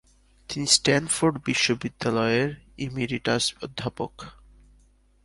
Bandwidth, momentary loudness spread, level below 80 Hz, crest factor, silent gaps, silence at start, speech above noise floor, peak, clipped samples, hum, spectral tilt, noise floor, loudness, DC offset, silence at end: 11.5 kHz; 16 LU; -54 dBFS; 24 dB; none; 0.5 s; 34 dB; -2 dBFS; under 0.1%; 50 Hz at -55 dBFS; -3.5 dB/octave; -59 dBFS; -25 LUFS; under 0.1%; 0.95 s